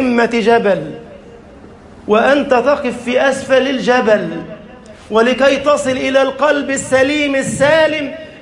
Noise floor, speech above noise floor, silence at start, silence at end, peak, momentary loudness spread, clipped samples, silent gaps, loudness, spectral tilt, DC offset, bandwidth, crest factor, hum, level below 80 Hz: -38 dBFS; 24 dB; 0 s; 0 s; 0 dBFS; 12 LU; under 0.1%; none; -13 LUFS; -4 dB/octave; under 0.1%; 11.5 kHz; 14 dB; none; -48 dBFS